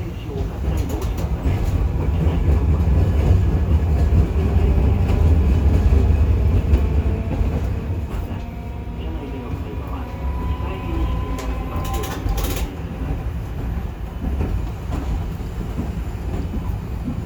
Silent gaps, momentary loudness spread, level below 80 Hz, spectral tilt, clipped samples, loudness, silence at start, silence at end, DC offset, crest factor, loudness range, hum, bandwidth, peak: none; 11 LU; -22 dBFS; -7.5 dB/octave; under 0.1%; -22 LUFS; 0 s; 0 s; under 0.1%; 16 dB; 9 LU; none; 19.5 kHz; -4 dBFS